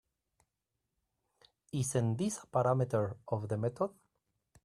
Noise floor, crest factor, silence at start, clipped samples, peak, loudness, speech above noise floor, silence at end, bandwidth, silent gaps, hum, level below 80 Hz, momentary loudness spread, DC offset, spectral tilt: -87 dBFS; 18 dB; 1.75 s; under 0.1%; -18 dBFS; -34 LUFS; 54 dB; 0.75 s; 13 kHz; none; none; -70 dBFS; 8 LU; under 0.1%; -6.5 dB/octave